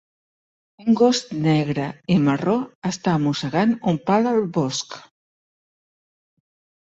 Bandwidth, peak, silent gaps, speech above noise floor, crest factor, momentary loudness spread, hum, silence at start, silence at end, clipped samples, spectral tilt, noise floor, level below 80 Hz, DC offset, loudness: 8 kHz; -4 dBFS; 2.75-2.82 s; over 70 dB; 18 dB; 9 LU; none; 0.8 s; 1.85 s; under 0.1%; -6 dB/octave; under -90 dBFS; -60 dBFS; under 0.1%; -21 LUFS